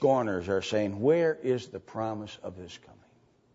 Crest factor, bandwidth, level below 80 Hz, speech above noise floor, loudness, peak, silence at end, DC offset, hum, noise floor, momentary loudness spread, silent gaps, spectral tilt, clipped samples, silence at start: 16 dB; 8 kHz; -66 dBFS; 35 dB; -29 LUFS; -12 dBFS; 0.8 s; under 0.1%; none; -64 dBFS; 18 LU; none; -6 dB/octave; under 0.1%; 0 s